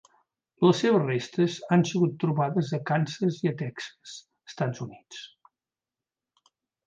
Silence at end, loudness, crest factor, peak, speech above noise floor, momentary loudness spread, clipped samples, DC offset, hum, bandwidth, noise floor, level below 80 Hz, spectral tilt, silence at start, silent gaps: 1.6 s; -26 LUFS; 18 dB; -10 dBFS; over 64 dB; 20 LU; under 0.1%; under 0.1%; none; 7.8 kHz; under -90 dBFS; -72 dBFS; -6.5 dB/octave; 0.6 s; none